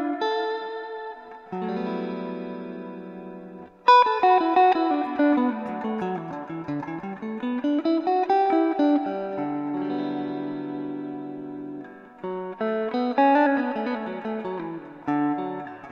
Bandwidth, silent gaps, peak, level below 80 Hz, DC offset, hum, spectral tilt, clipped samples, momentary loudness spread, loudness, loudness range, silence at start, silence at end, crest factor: 6.8 kHz; none; -4 dBFS; -70 dBFS; under 0.1%; none; -7 dB/octave; under 0.1%; 18 LU; -25 LUFS; 10 LU; 0 s; 0 s; 20 dB